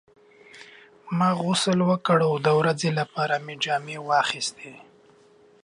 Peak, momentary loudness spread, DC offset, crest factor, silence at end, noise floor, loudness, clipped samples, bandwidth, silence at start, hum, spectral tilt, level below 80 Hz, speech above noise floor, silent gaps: -8 dBFS; 9 LU; under 0.1%; 18 dB; 0.85 s; -56 dBFS; -24 LUFS; under 0.1%; 11.5 kHz; 0.55 s; none; -5 dB/octave; -70 dBFS; 32 dB; none